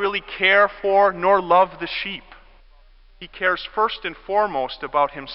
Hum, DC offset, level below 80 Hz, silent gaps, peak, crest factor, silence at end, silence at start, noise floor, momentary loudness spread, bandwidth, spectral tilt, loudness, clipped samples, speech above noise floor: none; under 0.1%; -50 dBFS; none; -4 dBFS; 18 dB; 0 s; 0 s; -50 dBFS; 11 LU; 5.8 kHz; -8 dB/octave; -20 LUFS; under 0.1%; 29 dB